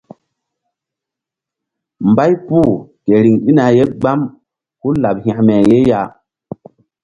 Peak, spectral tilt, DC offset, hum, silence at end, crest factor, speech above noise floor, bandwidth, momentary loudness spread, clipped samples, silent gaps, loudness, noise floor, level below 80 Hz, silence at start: 0 dBFS; -9 dB/octave; under 0.1%; none; 0.95 s; 14 dB; 72 dB; 7.6 kHz; 15 LU; under 0.1%; none; -13 LUFS; -84 dBFS; -46 dBFS; 2 s